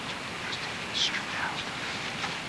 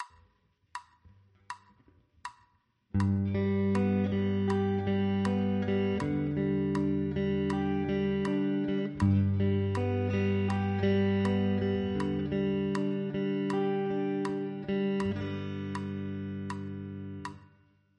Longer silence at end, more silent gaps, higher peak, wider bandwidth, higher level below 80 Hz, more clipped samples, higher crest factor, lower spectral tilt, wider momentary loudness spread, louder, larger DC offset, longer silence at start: second, 0 s vs 0.55 s; neither; about the same, -14 dBFS vs -14 dBFS; about the same, 11 kHz vs 10.5 kHz; about the same, -60 dBFS vs -56 dBFS; neither; about the same, 18 dB vs 16 dB; second, -2 dB/octave vs -8.5 dB/octave; second, 6 LU vs 13 LU; about the same, -31 LUFS vs -30 LUFS; neither; about the same, 0 s vs 0 s